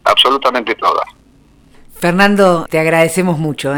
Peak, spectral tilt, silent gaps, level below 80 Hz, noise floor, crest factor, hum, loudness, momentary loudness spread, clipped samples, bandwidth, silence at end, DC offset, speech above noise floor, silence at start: 0 dBFS; -4.5 dB/octave; none; -46 dBFS; -47 dBFS; 14 dB; none; -12 LUFS; 8 LU; under 0.1%; over 20 kHz; 0 s; under 0.1%; 34 dB; 0.05 s